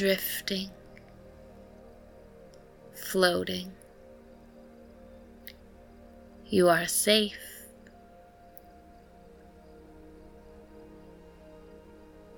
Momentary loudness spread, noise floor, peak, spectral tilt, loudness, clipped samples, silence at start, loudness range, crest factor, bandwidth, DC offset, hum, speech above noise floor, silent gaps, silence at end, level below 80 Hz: 29 LU; -54 dBFS; -8 dBFS; -3 dB/octave; -27 LUFS; under 0.1%; 0 s; 15 LU; 26 dB; 19 kHz; under 0.1%; none; 27 dB; none; 0 s; -58 dBFS